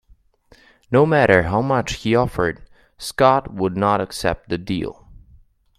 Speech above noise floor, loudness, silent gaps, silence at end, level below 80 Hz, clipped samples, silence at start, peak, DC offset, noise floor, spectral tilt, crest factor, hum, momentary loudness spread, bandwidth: 36 dB; -19 LUFS; none; 0.85 s; -44 dBFS; under 0.1%; 0.9 s; 0 dBFS; under 0.1%; -55 dBFS; -6 dB/octave; 20 dB; none; 12 LU; 15 kHz